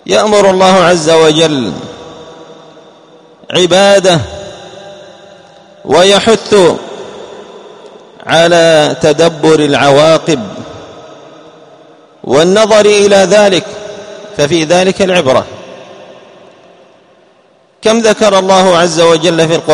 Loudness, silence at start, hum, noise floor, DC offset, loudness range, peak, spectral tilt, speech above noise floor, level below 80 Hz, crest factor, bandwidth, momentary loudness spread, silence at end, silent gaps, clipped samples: -8 LUFS; 0.05 s; none; -47 dBFS; under 0.1%; 5 LU; 0 dBFS; -4 dB/octave; 40 dB; -46 dBFS; 10 dB; 12 kHz; 22 LU; 0 s; none; 0.8%